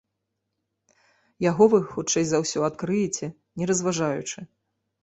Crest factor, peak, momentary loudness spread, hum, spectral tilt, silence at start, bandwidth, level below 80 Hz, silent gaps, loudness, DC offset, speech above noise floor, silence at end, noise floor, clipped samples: 22 dB; -4 dBFS; 13 LU; none; -4.5 dB/octave; 1.4 s; 8.4 kHz; -62 dBFS; none; -24 LUFS; under 0.1%; 56 dB; 0.6 s; -80 dBFS; under 0.1%